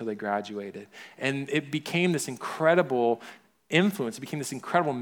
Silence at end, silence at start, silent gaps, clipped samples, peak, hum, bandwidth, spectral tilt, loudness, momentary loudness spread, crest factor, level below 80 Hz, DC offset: 0 s; 0 s; none; under 0.1%; -8 dBFS; none; 19.5 kHz; -5 dB/octave; -28 LUFS; 14 LU; 20 dB; -78 dBFS; under 0.1%